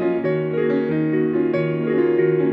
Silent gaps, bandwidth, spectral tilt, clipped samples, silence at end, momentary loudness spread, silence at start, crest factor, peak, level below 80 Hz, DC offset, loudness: none; 5 kHz; -10.5 dB/octave; under 0.1%; 0 s; 3 LU; 0 s; 12 dB; -8 dBFS; -60 dBFS; under 0.1%; -20 LUFS